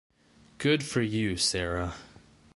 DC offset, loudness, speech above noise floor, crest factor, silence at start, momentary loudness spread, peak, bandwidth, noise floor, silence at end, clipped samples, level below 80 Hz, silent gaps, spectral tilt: under 0.1%; -28 LUFS; 23 dB; 18 dB; 0.6 s; 9 LU; -12 dBFS; 11.5 kHz; -51 dBFS; 0.5 s; under 0.1%; -48 dBFS; none; -4 dB/octave